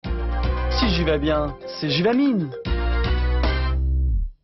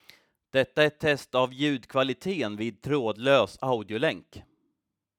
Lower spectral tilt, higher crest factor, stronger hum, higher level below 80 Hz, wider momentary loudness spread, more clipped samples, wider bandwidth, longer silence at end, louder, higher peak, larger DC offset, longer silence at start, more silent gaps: first, -7.5 dB/octave vs -5.5 dB/octave; about the same, 14 dB vs 18 dB; neither; first, -24 dBFS vs -64 dBFS; about the same, 6 LU vs 7 LU; neither; second, 6 kHz vs 15.5 kHz; second, 0.1 s vs 0.75 s; first, -22 LUFS vs -27 LUFS; about the same, -8 dBFS vs -8 dBFS; neither; second, 0.05 s vs 0.55 s; neither